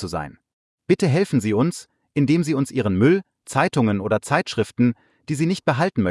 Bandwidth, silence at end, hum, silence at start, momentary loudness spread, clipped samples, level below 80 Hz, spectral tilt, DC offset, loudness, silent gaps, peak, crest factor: 12 kHz; 0 s; none; 0 s; 10 LU; under 0.1%; -56 dBFS; -6.5 dB/octave; under 0.1%; -21 LUFS; 0.53-0.78 s; -4 dBFS; 16 dB